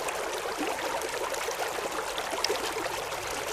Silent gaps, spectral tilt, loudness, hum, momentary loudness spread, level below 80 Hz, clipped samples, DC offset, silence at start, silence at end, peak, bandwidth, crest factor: none; -1.5 dB/octave; -31 LUFS; none; 3 LU; -58 dBFS; under 0.1%; under 0.1%; 0 s; 0 s; -8 dBFS; 15.5 kHz; 24 dB